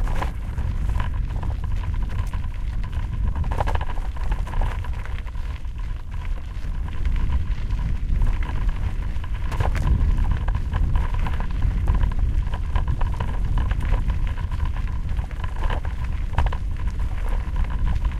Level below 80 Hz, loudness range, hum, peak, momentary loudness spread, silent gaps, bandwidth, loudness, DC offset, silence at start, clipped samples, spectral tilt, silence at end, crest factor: -24 dBFS; 5 LU; none; -6 dBFS; 7 LU; none; 8 kHz; -27 LUFS; under 0.1%; 0 s; under 0.1%; -7 dB/octave; 0 s; 16 dB